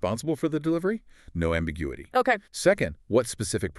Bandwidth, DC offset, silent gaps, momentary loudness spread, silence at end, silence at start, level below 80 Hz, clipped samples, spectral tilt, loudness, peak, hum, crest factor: 13.5 kHz; under 0.1%; none; 8 LU; 0 s; 0 s; -44 dBFS; under 0.1%; -5 dB/octave; -27 LUFS; -8 dBFS; none; 20 dB